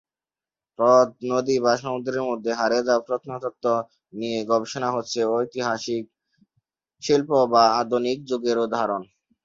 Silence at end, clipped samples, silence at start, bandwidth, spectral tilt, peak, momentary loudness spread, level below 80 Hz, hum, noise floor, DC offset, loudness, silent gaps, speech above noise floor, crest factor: 0.4 s; under 0.1%; 0.8 s; 7.8 kHz; -4.5 dB/octave; -2 dBFS; 11 LU; -66 dBFS; none; under -90 dBFS; under 0.1%; -23 LUFS; none; over 68 dB; 20 dB